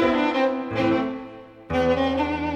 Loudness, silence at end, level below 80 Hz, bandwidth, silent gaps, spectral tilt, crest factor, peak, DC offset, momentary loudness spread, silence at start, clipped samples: -23 LUFS; 0 s; -46 dBFS; 8.2 kHz; none; -6.5 dB/octave; 14 dB; -8 dBFS; under 0.1%; 14 LU; 0 s; under 0.1%